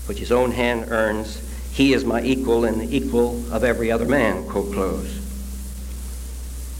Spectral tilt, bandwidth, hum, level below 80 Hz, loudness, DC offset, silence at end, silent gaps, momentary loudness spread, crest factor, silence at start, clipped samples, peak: -5.5 dB/octave; 16.5 kHz; none; -32 dBFS; -21 LUFS; under 0.1%; 0 s; none; 14 LU; 18 dB; 0 s; under 0.1%; -4 dBFS